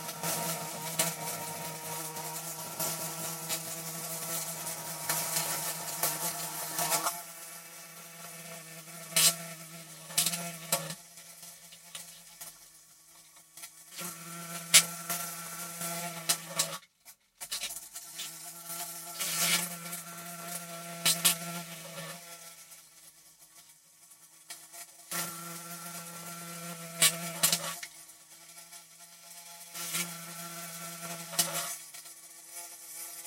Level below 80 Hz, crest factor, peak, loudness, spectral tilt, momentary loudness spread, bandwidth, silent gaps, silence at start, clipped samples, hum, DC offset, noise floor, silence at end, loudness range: -80 dBFS; 32 dB; -4 dBFS; -32 LUFS; -1 dB/octave; 20 LU; 17 kHz; none; 0 s; under 0.1%; none; under 0.1%; -59 dBFS; 0 s; 11 LU